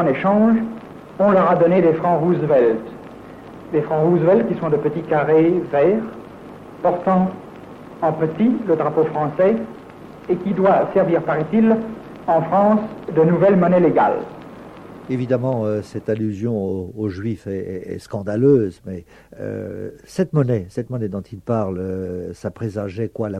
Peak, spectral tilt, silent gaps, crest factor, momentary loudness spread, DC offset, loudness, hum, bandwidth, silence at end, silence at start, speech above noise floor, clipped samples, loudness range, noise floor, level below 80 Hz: -4 dBFS; -9 dB/octave; none; 14 dB; 21 LU; under 0.1%; -19 LUFS; none; 10 kHz; 0 s; 0 s; 20 dB; under 0.1%; 7 LU; -38 dBFS; -54 dBFS